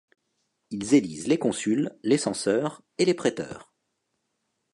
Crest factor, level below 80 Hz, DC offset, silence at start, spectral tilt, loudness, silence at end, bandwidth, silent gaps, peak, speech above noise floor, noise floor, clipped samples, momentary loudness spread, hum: 20 dB; -68 dBFS; under 0.1%; 0.7 s; -5 dB/octave; -25 LUFS; 1.1 s; 11.5 kHz; none; -8 dBFS; 53 dB; -78 dBFS; under 0.1%; 13 LU; none